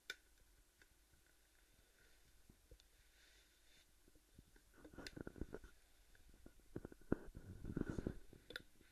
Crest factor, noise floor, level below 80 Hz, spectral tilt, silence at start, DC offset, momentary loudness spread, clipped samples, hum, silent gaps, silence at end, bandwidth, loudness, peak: 34 dB; -73 dBFS; -62 dBFS; -6 dB/octave; 0.05 s; under 0.1%; 22 LU; under 0.1%; none; none; 0 s; 13 kHz; -52 LUFS; -22 dBFS